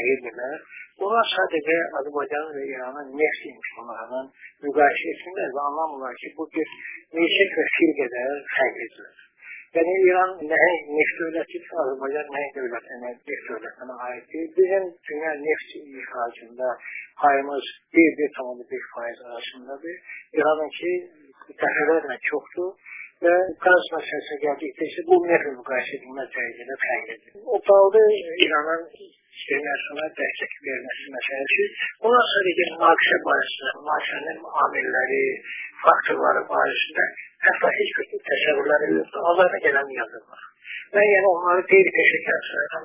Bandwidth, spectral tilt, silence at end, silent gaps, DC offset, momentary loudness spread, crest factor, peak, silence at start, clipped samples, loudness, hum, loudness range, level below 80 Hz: 3.8 kHz; -7 dB/octave; 0 s; none; under 0.1%; 16 LU; 22 dB; 0 dBFS; 0 s; under 0.1%; -22 LUFS; none; 7 LU; -70 dBFS